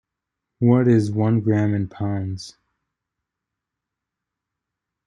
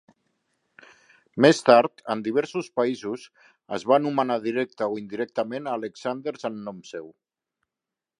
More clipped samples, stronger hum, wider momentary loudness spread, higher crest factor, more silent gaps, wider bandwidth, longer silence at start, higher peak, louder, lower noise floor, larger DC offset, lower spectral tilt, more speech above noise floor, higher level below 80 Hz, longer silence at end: neither; neither; second, 14 LU vs 18 LU; about the same, 20 dB vs 24 dB; neither; about the same, 10 kHz vs 11 kHz; second, 0.6 s vs 1.35 s; second, -4 dBFS vs 0 dBFS; first, -20 LUFS vs -24 LUFS; second, -84 dBFS vs -88 dBFS; neither; first, -8.5 dB/octave vs -5.5 dB/octave; about the same, 65 dB vs 64 dB; first, -62 dBFS vs -74 dBFS; first, 2.55 s vs 1.1 s